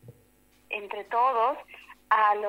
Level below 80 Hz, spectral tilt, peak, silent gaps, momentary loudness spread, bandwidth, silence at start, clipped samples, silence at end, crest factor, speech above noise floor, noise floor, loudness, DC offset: -70 dBFS; -4 dB/octave; -10 dBFS; none; 19 LU; 16 kHz; 0.05 s; under 0.1%; 0 s; 18 dB; 36 dB; -62 dBFS; -27 LUFS; under 0.1%